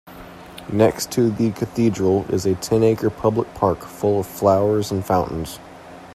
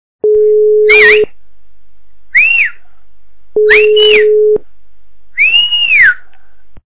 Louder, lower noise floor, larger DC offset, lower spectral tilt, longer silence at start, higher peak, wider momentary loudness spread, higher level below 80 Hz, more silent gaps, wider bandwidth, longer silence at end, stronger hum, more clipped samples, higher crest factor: second, -20 LUFS vs -7 LUFS; second, -39 dBFS vs -54 dBFS; second, under 0.1% vs 7%; first, -6.5 dB/octave vs -4.5 dB/octave; second, 0.05 s vs 0.2 s; about the same, -2 dBFS vs 0 dBFS; first, 19 LU vs 11 LU; about the same, -48 dBFS vs -46 dBFS; neither; first, 15.5 kHz vs 4 kHz; about the same, 0 s vs 0.1 s; neither; second, under 0.1% vs 0.4%; first, 18 dB vs 10 dB